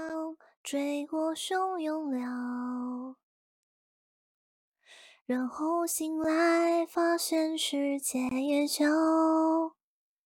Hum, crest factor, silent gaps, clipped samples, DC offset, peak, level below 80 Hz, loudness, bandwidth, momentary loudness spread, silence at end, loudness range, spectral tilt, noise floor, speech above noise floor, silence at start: none; 14 dB; 0.57-0.64 s, 3.23-4.72 s, 5.21-5.26 s; under 0.1%; under 0.1%; -16 dBFS; -76 dBFS; -30 LUFS; 17 kHz; 12 LU; 0.55 s; 11 LU; -2 dB/octave; -57 dBFS; 28 dB; 0 s